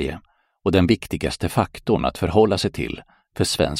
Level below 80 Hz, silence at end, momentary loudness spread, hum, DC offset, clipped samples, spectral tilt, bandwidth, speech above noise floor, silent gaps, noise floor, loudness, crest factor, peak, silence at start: -40 dBFS; 0 s; 12 LU; none; under 0.1%; under 0.1%; -5.5 dB/octave; 16 kHz; 26 dB; none; -46 dBFS; -21 LUFS; 18 dB; -4 dBFS; 0 s